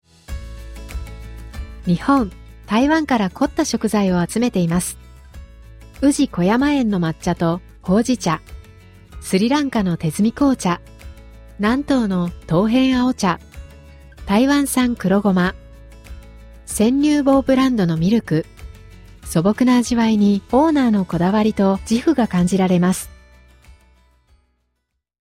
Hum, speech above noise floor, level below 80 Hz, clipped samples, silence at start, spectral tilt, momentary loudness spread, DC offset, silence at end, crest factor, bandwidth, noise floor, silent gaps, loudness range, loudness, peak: none; 57 dB; -40 dBFS; under 0.1%; 0.3 s; -6 dB/octave; 17 LU; under 0.1%; 2.2 s; 16 dB; 16 kHz; -74 dBFS; none; 4 LU; -18 LUFS; -4 dBFS